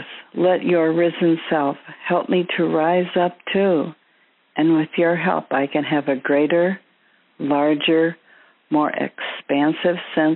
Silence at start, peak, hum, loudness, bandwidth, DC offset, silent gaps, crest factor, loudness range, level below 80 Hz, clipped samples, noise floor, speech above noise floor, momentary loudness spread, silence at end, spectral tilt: 0 s; -4 dBFS; none; -20 LUFS; 4.2 kHz; under 0.1%; none; 16 dB; 2 LU; -72 dBFS; under 0.1%; -60 dBFS; 41 dB; 7 LU; 0 s; -4.5 dB/octave